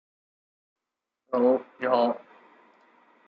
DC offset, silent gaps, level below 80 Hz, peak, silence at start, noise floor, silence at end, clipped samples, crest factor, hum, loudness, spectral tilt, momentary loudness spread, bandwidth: under 0.1%; none; -86 dBFS; -10 dBFS; 1.3 s; -87 dBFS; 1.1 s; under 0.1%; 20 dB; none; -25 LUFS; -8 dB/octave; 8 LU; 5.2 kHz